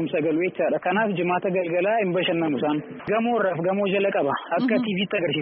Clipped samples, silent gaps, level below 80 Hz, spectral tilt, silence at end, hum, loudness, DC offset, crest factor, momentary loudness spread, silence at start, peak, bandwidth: under 0.1%; none; -66 dBFS; -4 dB/octave; 0 s; none; -23 LUFS; under 0.1%; 12 dB; 3 LU; 0 s; -10 dBFS; 4.5 kHz